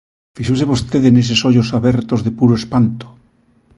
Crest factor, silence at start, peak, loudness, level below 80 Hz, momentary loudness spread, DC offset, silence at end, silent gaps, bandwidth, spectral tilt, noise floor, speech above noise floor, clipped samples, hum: 14 dB; 0.35 s; 0 dBFS; -14 LUFS; -40 dBFS; 7 LU; under 0.1%; 0.7 s; none; 11.5 kHz; -6.5 dB/octave; -54 dBFS; 41 dB; under 0.1%; none